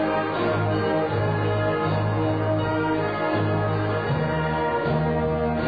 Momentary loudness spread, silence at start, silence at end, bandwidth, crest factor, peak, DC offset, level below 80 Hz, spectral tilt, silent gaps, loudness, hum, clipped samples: 1 LU; 0 s; 0 s; 5 kHz; 12 dB; -10 dBFS; 0.2%; -44 dBFS; -10 dB/octave; none; -24 LUFS; none; under 0.1%